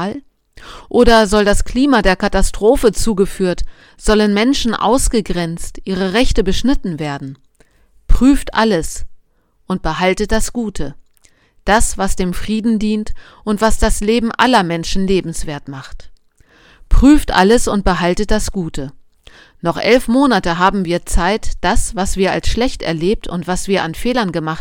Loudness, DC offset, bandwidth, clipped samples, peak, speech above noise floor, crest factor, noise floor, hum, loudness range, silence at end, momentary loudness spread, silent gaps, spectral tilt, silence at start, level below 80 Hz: -15 LUFS; under 0.1%; 16.5 kHz; 0.2%; 0 dBFS; 40 dB; 14 dB; -54 dBFS; none; 4 LU; 0 s; 13 LU; none; -4.5 dB/octave; 0 s; -22 dBFS